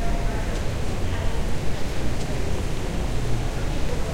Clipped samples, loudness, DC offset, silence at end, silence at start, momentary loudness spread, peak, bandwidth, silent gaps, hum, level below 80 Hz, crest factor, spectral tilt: under 0.1%; -28 LUFS; under 0.1%; 0 s; 0 s; 2 LU; -10 dBFS; 15.5 kHz; none; none; -26 dBFS; 12 dB; -5.5 dB/octave